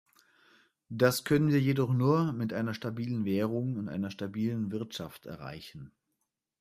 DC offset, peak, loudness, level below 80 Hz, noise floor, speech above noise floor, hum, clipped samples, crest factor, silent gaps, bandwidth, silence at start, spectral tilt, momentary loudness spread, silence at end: under 0.1%; -12 dBFS; -30 LUFS; -66 dBFS; -83 dBFS; 53 dB; none; under 0.1%; 20 dB; none; 15.5 kHz; 0.9 s; -6.5 dB/octave; 17 LU; 0.75 s